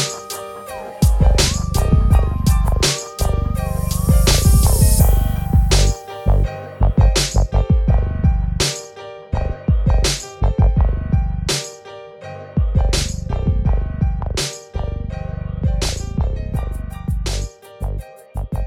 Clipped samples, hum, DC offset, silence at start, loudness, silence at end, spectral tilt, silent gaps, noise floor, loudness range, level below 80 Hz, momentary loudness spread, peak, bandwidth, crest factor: under 0.1%; none; under 0.1%; 0 s; -19 LUFS; 0 s; -5 dB/octave; none; -36 dBFS; 7 LU; -20 dBFS; 14 LU; -2 dBFS; 17.5 kHz; 16 dB